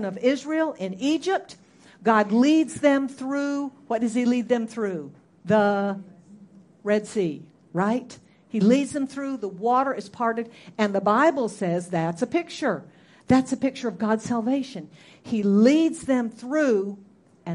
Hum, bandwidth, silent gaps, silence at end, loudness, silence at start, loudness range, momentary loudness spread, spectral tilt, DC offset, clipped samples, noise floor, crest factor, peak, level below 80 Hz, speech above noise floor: none; 11.5 kHz; none; 0 s; -24 LUFS; 0 s; 3 LU; 12 LU; -6 dB/octave; under 0.1%; under 0.1%; -50 dBFS; 18 dB; -6 dBFS; -64 dBFS; 27 dB